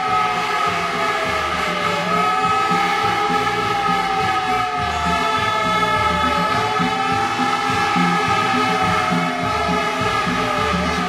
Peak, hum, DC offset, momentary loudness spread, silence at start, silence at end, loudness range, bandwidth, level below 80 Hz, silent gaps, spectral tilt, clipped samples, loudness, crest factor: -6 dBFS; none; under 0.1%; 3 LU; 0 s; 0 s; 1 LU; 16 kHz; -42 dBFS; none; -4 dB/octave; under 0.1%; -18 LUFS; 14 dB